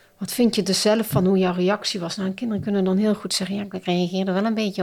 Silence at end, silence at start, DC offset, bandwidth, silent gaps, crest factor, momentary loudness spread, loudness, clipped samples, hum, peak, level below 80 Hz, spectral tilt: 0 s; 0.2 s; under 0.1%; 16 kHz; none; 14 dB; 7 LU; -22 LUFS; under 0.1%; none; -8 dBFS; -56 dBFS; -5 dB/octave